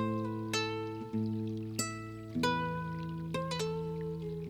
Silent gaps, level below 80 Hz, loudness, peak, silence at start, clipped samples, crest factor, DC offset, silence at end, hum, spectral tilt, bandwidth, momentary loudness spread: none; -60 dBFS; -36 LUFS; -18 dBFS; 0 s; under 0.1%; 18 dB; under 0.1%; 0 s; none; -5 dB/octave; 19 kHz; 6 LU